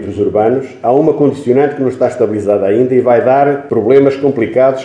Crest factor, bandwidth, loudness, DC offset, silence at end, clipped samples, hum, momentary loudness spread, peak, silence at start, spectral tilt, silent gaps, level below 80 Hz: 10 dB; 9.8 kHz; -11 LUFS; under 0.1%; 0 s; 0.2%; none; 5 LU; 0 dBFS; 0 s; -8.5 dB/octave; none; -54 dBFS